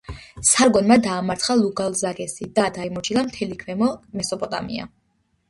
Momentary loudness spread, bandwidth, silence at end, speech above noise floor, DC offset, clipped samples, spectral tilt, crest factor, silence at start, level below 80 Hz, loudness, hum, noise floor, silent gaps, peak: 14 LU; 11.5 kHz; 0.6 s; 47 dB; under 0.1%; under 0.1%; -3.5 dB/octave; 20 dB; 0.1 s; -50 dBFS; -21 LUFS; none; -67 dBFS; none; -2 dBFS